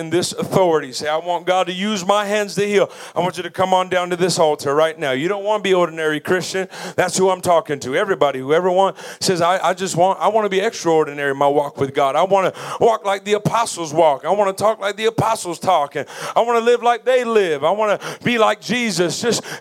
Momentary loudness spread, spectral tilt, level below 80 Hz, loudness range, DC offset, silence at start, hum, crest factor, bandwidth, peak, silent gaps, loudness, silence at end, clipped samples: 5 LU; -4 dB/octave; -64 dBFS; 1 LU; under 0.1%; 0 s; none; 18 dB; 16.5 kHz; 0 dBFS; none; -18 LUFS; 0 s; under 0.1%